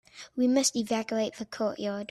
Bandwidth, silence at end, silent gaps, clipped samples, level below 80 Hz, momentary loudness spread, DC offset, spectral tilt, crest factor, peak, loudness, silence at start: 14 kHz; 0.05 s; none; under 0.1%; -70 dBFS; 10 LU; under 0.1%; -3 dB/octave; 18 dB; -12 dBFS; -29 LUFS; 0.15 s